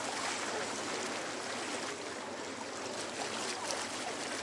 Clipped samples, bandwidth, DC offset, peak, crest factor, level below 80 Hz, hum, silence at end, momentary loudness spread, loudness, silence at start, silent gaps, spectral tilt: under 0.1%; 11.5 kHz; under 0.1%; -18 dBFS; 22 dB; -82 dBFS; none; 0 s; 5 LU; -38 LUFS; 0 s; none; -1.5 dB/octave